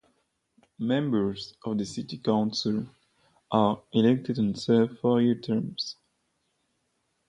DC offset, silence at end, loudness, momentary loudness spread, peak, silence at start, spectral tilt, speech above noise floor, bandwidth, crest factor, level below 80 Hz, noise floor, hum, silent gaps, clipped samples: under 0.1%; 1.35 s; -27 LUFS; 11 LU; -8 dBFS; 0.8 s; -6.5 dB/octave; 49 dB; 9.8 kHz; 20 dB; -64 dBFS; -75 dBFS; none; none; under 0.1%